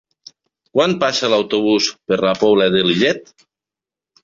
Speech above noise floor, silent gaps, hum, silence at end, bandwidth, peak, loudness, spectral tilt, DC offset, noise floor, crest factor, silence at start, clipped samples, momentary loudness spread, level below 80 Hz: 72 dB; none; none; 1.05 s; 7.6 kHz; -2 dBFS; -16 LUFS; -4.5 dB/octave; under 0.1%; -88 dBFS; 16 dB; 0.75 s; under 0.1%; 5 LU; -58 dBFS